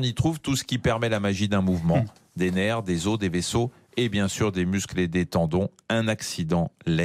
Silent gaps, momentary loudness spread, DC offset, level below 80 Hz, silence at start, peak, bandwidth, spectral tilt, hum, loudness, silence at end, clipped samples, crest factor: none; 4 LU; under 0.1%; -50 dBFS; 0 s; -12 dBFS; 15.5 kHz; -5.5 dB/octave; none; -25 LUFS; 0 s; under 0.1%; 14 dB